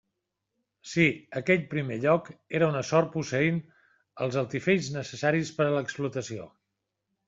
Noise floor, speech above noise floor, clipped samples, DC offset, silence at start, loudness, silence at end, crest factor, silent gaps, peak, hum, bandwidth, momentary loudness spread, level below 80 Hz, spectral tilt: -83 dBFS; 56 dB; under 0.1%; under 0.1%; 0.85 s; -28 LUFS; 0.8 s; 20 dB; none; -8 dBFS; none; 7.8 kHz; 9 LU; -66 dBFS; -6 dB/octave